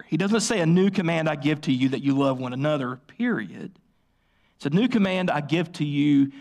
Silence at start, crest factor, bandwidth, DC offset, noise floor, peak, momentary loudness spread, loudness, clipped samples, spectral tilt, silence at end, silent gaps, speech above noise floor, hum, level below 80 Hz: 0.1 s; 12 dB; 12 kHz; under 0.1%; -66 dBFS; -12 dBFS; 9 LU; -24 LUFS; under 0.1%; -6 dB/octave; 0 s; none; 43 dB; none; -64 dBFS